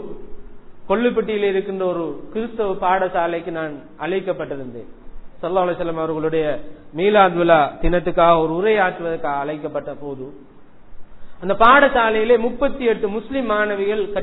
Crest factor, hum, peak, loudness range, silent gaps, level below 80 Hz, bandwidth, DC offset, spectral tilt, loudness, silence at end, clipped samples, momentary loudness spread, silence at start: 20 dB; none; 0 dBFS; 7 LU; none; -38 dBFS; 4.1 kHz; under 0.1%; -9.5 dB/octave; -19 LUFS; 0 s; under 0.1%; 16 LU; 0 s